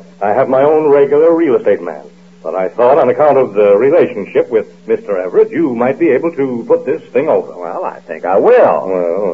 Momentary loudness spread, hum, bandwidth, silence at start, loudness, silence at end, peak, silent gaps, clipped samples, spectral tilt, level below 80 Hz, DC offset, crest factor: 12 LU; none; 6.2 kHz; 0.2 s; -12 LUFS; 0 s; 0 dBFS; none; under 0.1%; -8.5 dB/octave; -64 dBFS; 0.4%; 12 dB